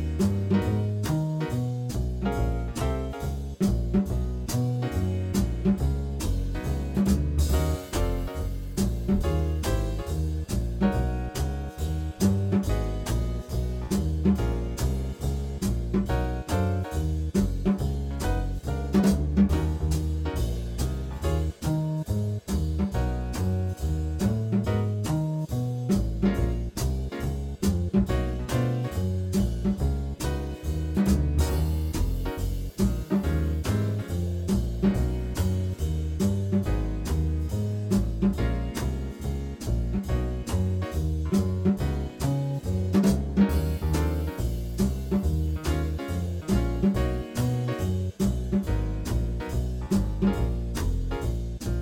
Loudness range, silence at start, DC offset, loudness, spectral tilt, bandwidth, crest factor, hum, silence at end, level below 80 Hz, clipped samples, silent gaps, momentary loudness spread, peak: 2 LU; 0 s; under 0.1%; -28 LUFS; -7 dB/octave; 17 kHz; 16 dB; none; 0 s; -30 dBFS; under 0.1%; none; 6 LU; -10 dBFS